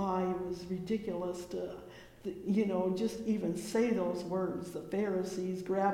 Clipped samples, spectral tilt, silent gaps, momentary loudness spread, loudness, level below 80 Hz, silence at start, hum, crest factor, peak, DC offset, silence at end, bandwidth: under 0.1%; -6.5 dB/octave; none; 10 LU; -35 LUFS; -64 dBFS; 0 s; none; 14 dB; -20 dBFS; under 0.1%; 0 s; 16.5 kHz